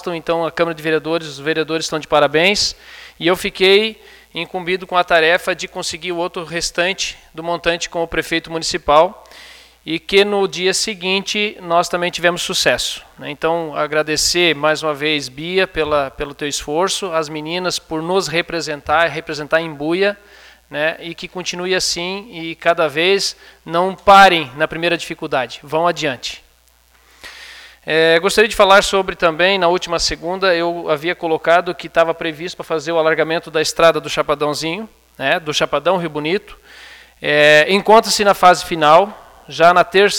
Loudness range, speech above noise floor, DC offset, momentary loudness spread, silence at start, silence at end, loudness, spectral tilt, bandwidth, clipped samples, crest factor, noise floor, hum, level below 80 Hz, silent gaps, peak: 6 LU; 37 dB; under 0.1%; 12 LU; 0 s; 0 s; -16 LUFS; -3 dB/octave; 18.5 kHz; under 0.1%; 16 dB; -53 dBFS; none; -46 dBFS; none; 0 dBFS